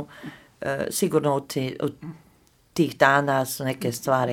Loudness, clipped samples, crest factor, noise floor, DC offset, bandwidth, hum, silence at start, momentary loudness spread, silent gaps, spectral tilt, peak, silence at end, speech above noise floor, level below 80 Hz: -24 LUFS; under 0.1%; 22 dB; -59 dBFS; under 0.1%; 18 kHz; none; 0 s; 21 LU; none; -5 dB/octave; -2 dBFS; 0 s; 35 dB; -62 dBFS